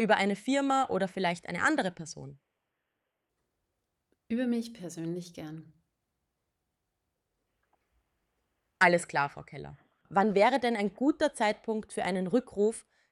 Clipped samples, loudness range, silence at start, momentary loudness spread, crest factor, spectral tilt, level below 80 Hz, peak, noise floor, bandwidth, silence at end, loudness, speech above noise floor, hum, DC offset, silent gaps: under 0.1%; 11 LU; 0 s; 20 LU; 22 dB; -5 dB/octave; -70 dBFS; -10 dBFS; -84 dBFS; 12.5 kHz; 0.3 s; -29 LUFS; 54 dB; none; under 0.1%; none